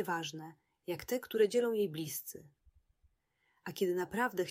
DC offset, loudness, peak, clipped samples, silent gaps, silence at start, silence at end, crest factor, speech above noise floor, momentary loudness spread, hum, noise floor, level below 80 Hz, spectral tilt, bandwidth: under 0.1%; -35 LUFS; -18 dBFS; under 0.1%; none; 0 s; 0 s; 18 dB; 43 dB; 19 LU; none; -78 dBFS; -72 dBFS; -4.5 dB/octave; 16 kHz